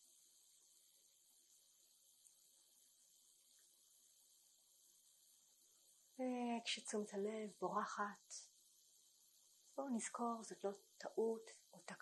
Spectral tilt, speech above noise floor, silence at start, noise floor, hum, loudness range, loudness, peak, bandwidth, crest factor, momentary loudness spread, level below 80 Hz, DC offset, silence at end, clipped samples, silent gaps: -3.5 dB/octave; 27 dB; 6.2 s; -74 dBFS; none; 23 LU; -47 LUFS; -28 dBFS; 12 kHz; 22 dB; 25 LU; under -90 dBFS; under 0.1%; 0.05 s; under 0.1%; none